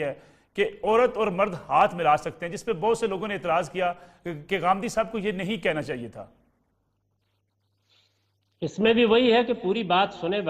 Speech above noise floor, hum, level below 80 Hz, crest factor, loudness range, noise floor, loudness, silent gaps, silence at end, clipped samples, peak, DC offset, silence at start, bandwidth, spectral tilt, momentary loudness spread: 48 dB; none; -58 dBFS; 18 dB; 9 LU; -73 dBFS; -25 LUFS; none; 0 s; under 0.1%; -8 dBFS; under 0.1%; 0 s; 13 kHz; -5 dB/octave; 14 LU